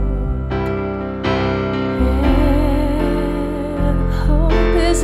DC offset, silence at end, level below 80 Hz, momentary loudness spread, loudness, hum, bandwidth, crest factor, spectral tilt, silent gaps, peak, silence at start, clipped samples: under 0.1%; 0 s; -20 dBFS; 6 LU; -18 LUFS; none; 12.5 kHz; 12 dB; -6.5 dB/octave; none; -4 dBFS; 0 s; under 0.1%